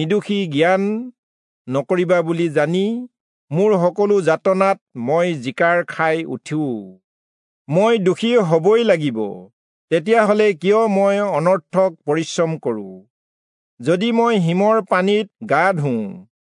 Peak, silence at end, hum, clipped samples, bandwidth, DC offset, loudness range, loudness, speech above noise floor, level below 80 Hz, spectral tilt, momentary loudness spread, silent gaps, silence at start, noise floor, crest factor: -2 dBFS; 0.35 s; none; under 0.1%; 11 kHz; under 0.1%; 3 LU; -18 LUFS; over 73 dB; -74 dBFS; -6.5 dB/octave; 10 LU; 1.18-1.65 s, 3.20-3.48 s, 4.81-4.86 s, 7.04-7.65 s, 9.53-9.88 s, 13.10-13.78 s; 0 s; under -90 dBFS; 16 dB